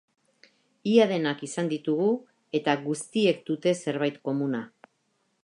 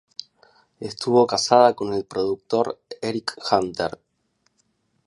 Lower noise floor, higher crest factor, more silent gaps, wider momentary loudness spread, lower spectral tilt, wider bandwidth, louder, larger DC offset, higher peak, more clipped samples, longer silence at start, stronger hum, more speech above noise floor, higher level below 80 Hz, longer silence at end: first, -73 dBFS vs -69 dBFS; about the same, 20 dB vs 22 dB; neither; second, 10 LU vs 16 LU; about the same, -5.5 dB/octave vs -4.5 dB/octave; about the same, 11 kHz vs 11.5 kHz; second, -27 LUFS vs -22 LUFS; neither; second, -8 dBFS vs -2 dBFS; neither; about the same, 0.85 s vs 0.8 s; neither; about the same, 47 dB vs 48 dB; second, -80 dBFS vs -60 dBFS; second, 0.75 s vs 1.15 s